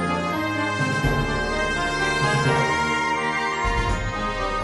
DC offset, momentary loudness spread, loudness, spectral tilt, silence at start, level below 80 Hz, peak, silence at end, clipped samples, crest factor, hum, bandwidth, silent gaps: under 0.1%; 5 LU; -22 LUFS; -4.5 dB/octave; 0 s; -34 dBFS; -10 dBFS; 0 s; under 0.1%; 14 dB; none; 11.5 kHz; none